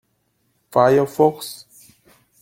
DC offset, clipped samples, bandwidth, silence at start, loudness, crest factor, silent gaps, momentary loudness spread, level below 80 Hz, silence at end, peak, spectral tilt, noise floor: under 0.1%; under 0.1%; 17 kHz; 0.75 s; -17 LUFS; 20 dB; none; 18 LU; -62 dBFS; 0.85 s; 0 dBFS; -6 dB/octave; -67 dBFS